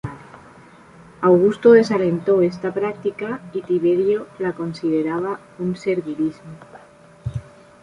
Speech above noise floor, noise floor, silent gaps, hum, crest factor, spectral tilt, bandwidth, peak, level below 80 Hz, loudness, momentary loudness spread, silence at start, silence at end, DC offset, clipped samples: 28 dB; -46 dBFS; none; none; 18 dB; -8 dB/octave; 10.5 kHz; -2 dBFS; -52 dBFS; -19 LUFS; 17 LU; 0.05 s; 0.4 s; under 0.1%; under 0.1%